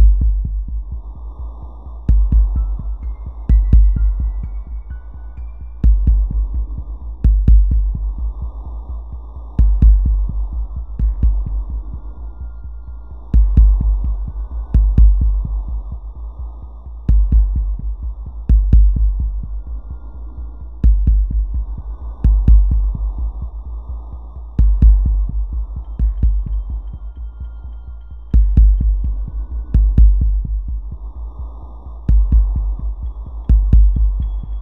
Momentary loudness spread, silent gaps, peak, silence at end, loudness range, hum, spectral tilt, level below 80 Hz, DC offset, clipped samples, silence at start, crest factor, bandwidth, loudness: 19 LU; none; 0 dBFS; 0 s; 4 LU; none; -12 dB/octave; -16 dBFS; 1%; under 0.1%; 0 s; 14 dB; 1.3 kHz; -18 LUFS